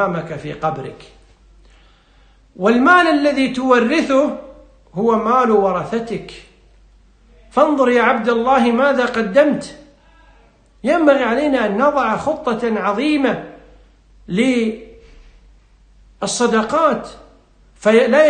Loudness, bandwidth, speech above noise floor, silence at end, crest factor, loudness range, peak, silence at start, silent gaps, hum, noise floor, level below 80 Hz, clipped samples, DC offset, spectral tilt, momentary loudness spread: -16 LUFS; 9.6 kHz; 35 dB; 0 s; 16 dB; 5 LU; 0 dBFS; 0 s; none; none; -50 dBFS; -48 dBFS; under 0.1%; under 0.1%; -5 dB/octave; 13 LU